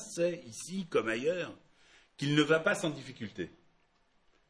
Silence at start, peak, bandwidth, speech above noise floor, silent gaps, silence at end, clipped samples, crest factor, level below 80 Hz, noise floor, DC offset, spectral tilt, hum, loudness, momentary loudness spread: 0 s; -14 dBFS; 11 kHz; 38 dB; none; 1 s; under 0.1%; 22 dB; -70 dBFS; -70 dBFS; under 0.1%; -4.5 dB/octave; none; -33 LUFS; 16 LU